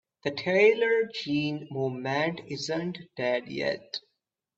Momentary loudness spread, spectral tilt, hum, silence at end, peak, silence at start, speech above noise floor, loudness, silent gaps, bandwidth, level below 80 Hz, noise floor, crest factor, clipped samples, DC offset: 13 LU; -5.5 dB/octave; none; 0.6 s; -8 dBFS; 0.25 s; 53 dB; -28 LUFS; none; 7.8 kHz; -70 dBFS; -81 dBFS; 20 dB; under 0.1%; under 0.1%